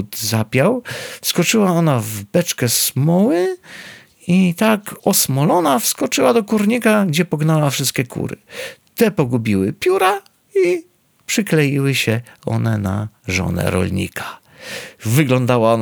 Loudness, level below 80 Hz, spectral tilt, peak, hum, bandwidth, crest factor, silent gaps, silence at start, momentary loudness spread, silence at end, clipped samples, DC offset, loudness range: -17 LUFS; -52 dBFS; -5 dB/octave; -2 dBFS; none; over 20 kHz; 16 dB; none; 0 s; 13 LU; 0 s; under 0.1%; under 0.1%; 4 LU